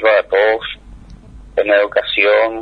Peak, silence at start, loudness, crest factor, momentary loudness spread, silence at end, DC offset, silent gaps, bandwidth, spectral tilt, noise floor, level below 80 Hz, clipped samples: 0 dBFS; 0 s; -14 LUFS; 16 dB; 11 LU; 0 s; under 0.1%; none; 5.2 kHz; -5 dB/octave; -37 dBFS; -42 dBFS; under 0.1%